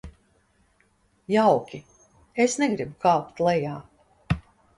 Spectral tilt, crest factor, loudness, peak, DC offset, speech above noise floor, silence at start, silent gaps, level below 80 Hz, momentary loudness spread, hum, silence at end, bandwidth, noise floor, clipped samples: -5.5 dB/octave; 20 dB; -24 LUFS; -8 dBFS; under 0.1%; 42 dB; 0.05 s; none; -50 dBFS; 15 LU; none; 0.4 s; 11.5 kHz; -65 dBFS; under 0.1%